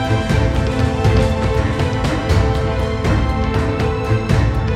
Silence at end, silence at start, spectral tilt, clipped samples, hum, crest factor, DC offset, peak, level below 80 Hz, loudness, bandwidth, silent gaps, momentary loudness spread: 0 s; 0 s; -7 dB/octave; under 0.1%; none; 14 dB; under 0.1%; -2 dBFS; -22 dBFS; -17 LUFS; 12.5 kHz; none; 3 LU